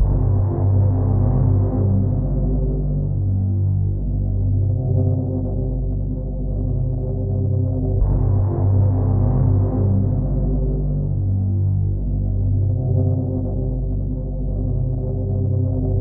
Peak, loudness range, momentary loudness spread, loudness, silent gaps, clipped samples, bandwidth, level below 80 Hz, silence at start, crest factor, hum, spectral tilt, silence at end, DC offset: -6 dBFS; 3 LU; 6 LU; -20 LUFS; none; under 0.1%; 1.6 kHz; -24 dBFS; 0 s; 12 dB; none; -16.5 dB/octave; 0 s; under 0.1%